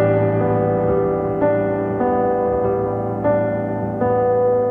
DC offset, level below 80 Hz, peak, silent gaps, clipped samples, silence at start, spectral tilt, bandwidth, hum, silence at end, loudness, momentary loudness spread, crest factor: under 0.1%; -42 dBFS; -4 dBFS; none; under 0.1%; 0 s; -11.5 dB/octave; 3.5 kHz; none; 0 s; -19 LUFS; 4 LU; 14 dB